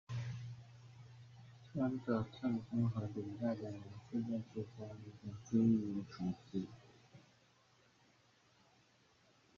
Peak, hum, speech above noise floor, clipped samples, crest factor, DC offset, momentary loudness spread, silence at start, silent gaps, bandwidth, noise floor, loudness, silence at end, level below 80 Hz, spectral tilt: -22 dBFS; none; 32 dB; under 0.1%; 20 dB; under 0.1%; 23 LU; 0.1 s; none; 7.2 kHz; -71 dBFS; -41 LUFS; 2.4 s; -72 dBFS; -8.5 dB/octave